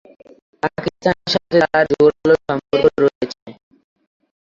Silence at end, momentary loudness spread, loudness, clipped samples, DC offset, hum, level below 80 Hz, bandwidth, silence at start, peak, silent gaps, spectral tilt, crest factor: 0.9 s; 11 LU; -17 LUFS; under 0.1%; under 0.1%; none; -50 dBFS; 7.4 kHz; 0.65 s; -2 dBFS; 3.15-3.21 s, 3.42-3.46 s; -6 dB/octave; 16 dB